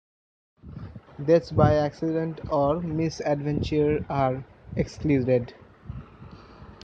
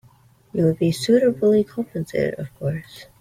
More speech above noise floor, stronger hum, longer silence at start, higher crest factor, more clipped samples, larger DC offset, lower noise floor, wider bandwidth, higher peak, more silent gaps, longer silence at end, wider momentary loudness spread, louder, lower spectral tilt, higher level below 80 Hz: second, 22 dB vs 33 dB; neither; about the same, 0.65 s vs 0.55 s; about the same, 20 dB vs 16 dB; neither; neither; second, -46 dBFS vs -54 dBFS; second, 7.8 kHz vs 15.5 kHz; about the same, -6 dBFS vs -6 dBFS; neither; about the same, 0.1 s vs 0.2 s; first, 20 LU vs 12 LU; second, -25 LUFS vs -21 LUFS; about the same, -8 dB/octave vs -7 dB/octave; first, -46 dBFS vs -56 dBFS